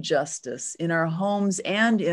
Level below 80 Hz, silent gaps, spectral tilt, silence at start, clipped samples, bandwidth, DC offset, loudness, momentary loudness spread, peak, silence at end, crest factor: -72 dBFS; none; -4.5 dB/octave; 0 s; under 0.1%; 11.5 kHz; under 0.1%; -25 LUFS; 10 LU; -10 dBFS; 0 s; 14 dB